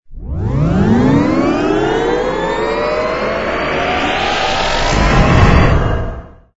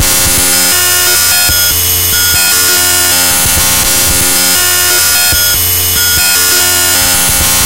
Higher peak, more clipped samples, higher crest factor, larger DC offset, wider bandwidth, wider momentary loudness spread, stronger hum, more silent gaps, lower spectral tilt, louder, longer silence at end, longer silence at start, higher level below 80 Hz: about the same, 0 dBFS vs 0 dBFS; second, under 0.1% vs 0.3%; first, 14 dB vs 8 dB; second, under 0.1% vs 3%; second, 8 kHz vs over 20 kHz; first, 8 LU vs 1 LU; neither; neither; first, -6 dB/octave vs -0.5 dB/octave; second, -14 LUFS vs -6 LUFS; first, 0.25 s vs 0 s; about the same, 0.1 s vs 0 s; first, -20 dBFS vs -28 dBFS